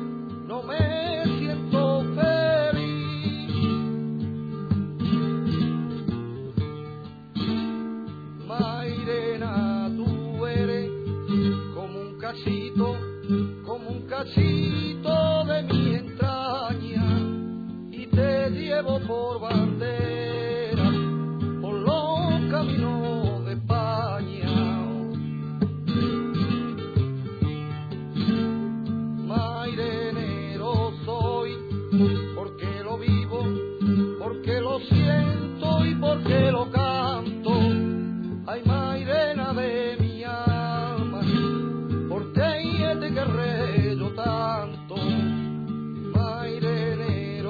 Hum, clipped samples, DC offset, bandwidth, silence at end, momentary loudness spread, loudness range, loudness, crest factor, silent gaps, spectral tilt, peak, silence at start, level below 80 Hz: none; under 0.1%; under 0.1%; 4.9 kHz; 0 s; 9 LU; 4 LU; -26 LUFS; 16 dB; none; -9.5 dB/octave; -8 dBFS; 0 s; -50 dBFS